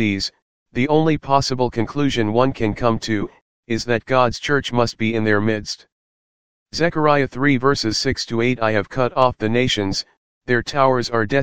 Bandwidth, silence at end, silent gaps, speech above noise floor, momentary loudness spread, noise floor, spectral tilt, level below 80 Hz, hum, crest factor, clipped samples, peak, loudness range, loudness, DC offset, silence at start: 15.5 kHz; 0 s; 0.42-0.66 s, 3.41-3.63 s, 5.92-6.66 s, 10.17-10.41 s; over 71 dB; 8 LU; under -90 dBFS; -5.5 dB/octave; -44 dBFS; none; 18 dB; under 0.1%; 0 dBFS; 2 LU; -19 LUFS; 2%; 0 s